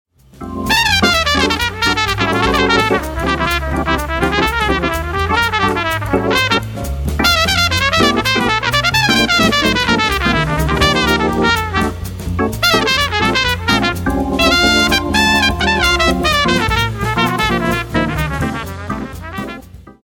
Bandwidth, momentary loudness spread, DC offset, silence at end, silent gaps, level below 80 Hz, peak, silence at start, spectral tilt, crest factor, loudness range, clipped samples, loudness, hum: 17.5 kHz; 9 LU; under 0.1%; 0.15 s; none; -26 dBFS; 0 dBFS; 0.35 s; -4 dB/octave; 14 dB; 3 LU; under 0.1%; -14 LUFS; none